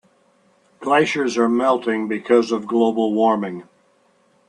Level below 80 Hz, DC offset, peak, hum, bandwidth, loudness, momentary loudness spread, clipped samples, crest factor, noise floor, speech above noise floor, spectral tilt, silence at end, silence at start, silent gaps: -68 dBFS; under 0.1%; -2 dBFS; none; 10.5 kHz; -19 LUFS; 6 LU; under 0.1%; 18 dB; -59 dBFS; 41 dB; -5 dB/octave; 0.85 s; 0.8 s; none